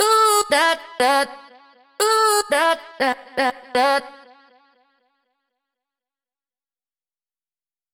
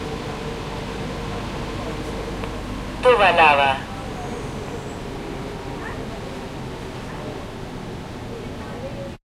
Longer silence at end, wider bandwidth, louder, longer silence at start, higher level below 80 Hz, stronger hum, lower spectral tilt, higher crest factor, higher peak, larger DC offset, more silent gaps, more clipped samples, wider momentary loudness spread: first, 3.85 s vs 0.1 s; first, 19 kHz vs 15.5 kHz; first, -19 LUFS vs -24 LUFS; about the same, 0 s vs 0 s; second, -66 dBFS vs -38 dBFS; neither; second, 0 dB/octave vs -5 dB/octave; about the same, 18 dB vs 22 dB; about the same, -4 dBFS vs -2 dBFS; neither; neither; neither; second, 7 LU vs 18 LU